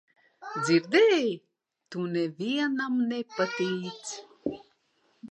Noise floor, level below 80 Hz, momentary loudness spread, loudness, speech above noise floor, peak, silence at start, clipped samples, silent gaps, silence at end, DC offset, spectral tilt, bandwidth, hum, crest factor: -70 dBFS; -74 dBFS; 17 LU; -28 LUFS; 43 dB; -10 dBFS; 0.4 s; under 0.1%; none; 0 s; under 0.1%; -5 dB/octave; 10.5 kHz; none; 20 dB